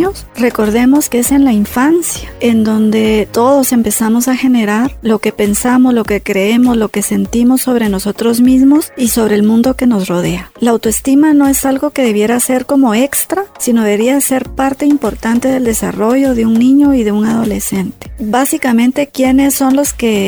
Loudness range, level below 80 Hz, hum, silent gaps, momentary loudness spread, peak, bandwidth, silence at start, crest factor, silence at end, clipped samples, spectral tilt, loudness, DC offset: 1 LU; -34 dBFS; none; none; 5 LU; 0 dBFS; over 20 kHz; 0 s; 10 dB; 0 s; under 0.1%; -4.5 dB/octave; -11 LUFS; under 0.1%